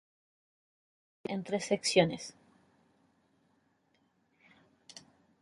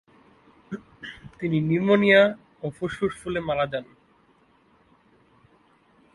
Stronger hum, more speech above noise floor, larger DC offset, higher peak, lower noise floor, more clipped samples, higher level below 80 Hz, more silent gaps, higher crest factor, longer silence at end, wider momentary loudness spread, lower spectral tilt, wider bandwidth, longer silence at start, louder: neither; first, 42 dB vs 38 dB; neither; second, -12 dBFS vs -4 dBFS; first, -74 dBFS vs -61 dBFS; neither; second, -74 dBFS vs -58 dBFS; neither; about the same, 26 dB vs 22 dB; second, 0.4 s vs 2.3 s; first, 25 LU vs 22 LU; second, -4 dB/octave vs -7 dB/octave; about the same, 11.5 kHz vs 11.5 kHz; first, 1.3 s vs 0.7 s; second, -31 LUFS vs -23 LUFS